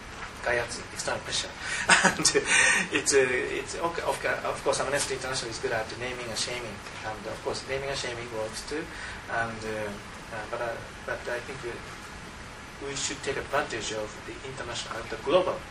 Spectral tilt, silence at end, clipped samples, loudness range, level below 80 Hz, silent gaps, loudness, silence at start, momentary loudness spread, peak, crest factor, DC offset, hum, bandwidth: -2 dB/octave; 0 s; under 0.1%; 11 LU; -52 dBFS; none; -28 LUFS; 0 s; 16 LU; -4 dBFS; 26 dB; under 0.1%; none; 15 kHz